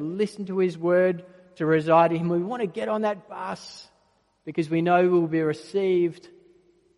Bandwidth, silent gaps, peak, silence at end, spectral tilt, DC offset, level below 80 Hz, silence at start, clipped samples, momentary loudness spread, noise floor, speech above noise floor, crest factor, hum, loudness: 11.5 kHz; none; -6 dBFS; 0.7 s; -7.5 dB/octave; under 0.1%; -72 dBFS; 0 s; under 0.1%; 15 LU; -66 dBFS; 42 dB; 18 dB; none; -24 LUFS